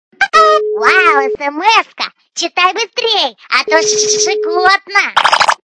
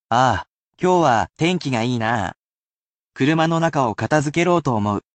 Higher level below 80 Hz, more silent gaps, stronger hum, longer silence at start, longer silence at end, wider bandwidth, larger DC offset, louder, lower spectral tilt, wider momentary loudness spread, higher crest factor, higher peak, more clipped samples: about the same, -56 dBFS vs -52 dBFS; second, none vs 0.50-0.72 s, 2.39-3.10 s; neither; about the same, 0.2 s vs 0.1 s; about the same, 0.15 s vs 0.15 s; first, 11 kHz vs 9 kHz; neither; first, -11 LUFS vs -19 LUFS; second, 0.5 dB/octave vs -6 dB/octave; first, 8 LU vs 5 LU; about the same, 12 dB vs 16 dB; first, 0 dBFS vs -4 dBFS; first, 0.2% vs under 0.1%